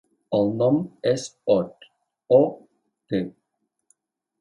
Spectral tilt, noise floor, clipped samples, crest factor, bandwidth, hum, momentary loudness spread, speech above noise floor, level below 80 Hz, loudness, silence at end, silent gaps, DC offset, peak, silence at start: -7 dB/octave; -78 dBFS; under 0.1%; 20 dB; 11 kHz; none; 10 LU; 56 dB; -64 dBFS; -23 LUFS; 1.1 s; none; under 0.1%; -4 dBFS; 0.3 s